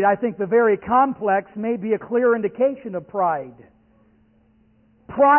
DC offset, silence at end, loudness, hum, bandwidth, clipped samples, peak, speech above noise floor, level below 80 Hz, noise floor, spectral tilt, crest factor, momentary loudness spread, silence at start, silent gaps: under 0.1%; 0 s; -21 LUFS; none; 3.2 kHz; under 0.1%; -6 dBFS; 38 dB; -60 dBFS; -58 dBFS; -11.5 dB/octave; 14 dB; 11 LU; 0 s; none